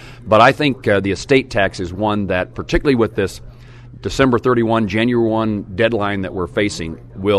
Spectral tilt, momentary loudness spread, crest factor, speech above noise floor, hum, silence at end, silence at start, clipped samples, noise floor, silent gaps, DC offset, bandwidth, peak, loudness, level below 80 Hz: -6 dB/octave; 10 LU; 16 dB; 21 dB; none; 0 s; 0 s; under 0.1%; -38 dBFS; none; under 0.1%; 13 kHz; 0 dBFS; -17 LUFS; -36 dBFS